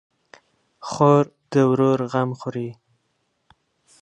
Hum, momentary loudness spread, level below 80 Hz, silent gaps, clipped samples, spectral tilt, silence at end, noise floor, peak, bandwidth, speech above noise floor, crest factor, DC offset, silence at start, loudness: none; 16 LU; -66 dBFS; none; under 0.1%; -7.5 dB/octave; 1.3 s; -71 dBFS; -2 dBFS; 10 kHz; 52 dB; 20 dB; under 0.1%; 0.85 s; -20 LUFS